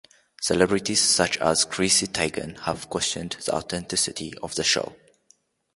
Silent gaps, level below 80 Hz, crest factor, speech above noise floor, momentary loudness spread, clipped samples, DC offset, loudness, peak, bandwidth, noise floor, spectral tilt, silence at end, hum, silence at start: none; -52 dBFS; 22 dB; 38 dB; 11 LU; under 0.1%; under 0.1%; -23 LUFS; -2 dBFS; 12 kHz; -63 dBFS; -2 dB/octave; 0.8 s; none; 0.4 s